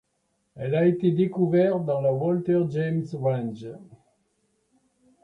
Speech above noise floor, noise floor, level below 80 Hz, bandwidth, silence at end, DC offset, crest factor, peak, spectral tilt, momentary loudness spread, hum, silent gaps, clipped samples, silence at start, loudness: 49 dB; -73 dBFS; -66 dBFS; 6.2 kHz; 1.3 s; under 0.1%; 16 dB; -10 dBFS; -10 dB/octave; 12 LU; none; none; under 0.1%; 0.55 s; -24 LUFS